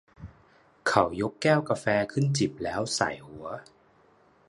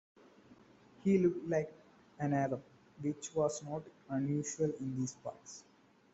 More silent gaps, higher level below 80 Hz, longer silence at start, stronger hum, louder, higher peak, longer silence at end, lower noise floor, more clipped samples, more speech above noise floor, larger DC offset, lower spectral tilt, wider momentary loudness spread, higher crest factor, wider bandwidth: neither; first, -58 dBFS vs -72 dBFS; second, 0.2 s vs 0.5 s; neither; first, -27 LUFS vs -37 LUFS; first, -4 dBFS vs -18 dBFS; first, 0.85 s vs 0.5 s; about the same, -61 dBFS vs -62 dBFS; neither; first, 34 dB vs 27 dB; neither; second, -5 dB/octave vs -6.5 dB/octave; about the same, 15 LU vs 15 LU; first, 24 dB vs 18 dB; first, 11.5 kHz vs 8.2 kHz